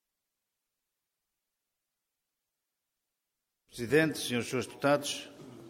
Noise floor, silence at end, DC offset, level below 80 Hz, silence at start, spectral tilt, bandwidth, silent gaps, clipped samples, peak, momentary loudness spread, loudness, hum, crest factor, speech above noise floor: -87 dBFS; 0 s; under 0.1%; -70 dBFS; 3.75 s; -4 dB/octave; 16.5 kHz; none; under 0.1%; -12 dBFS; 16 LU; -31 LUFS; none; 24 dB; 57 dB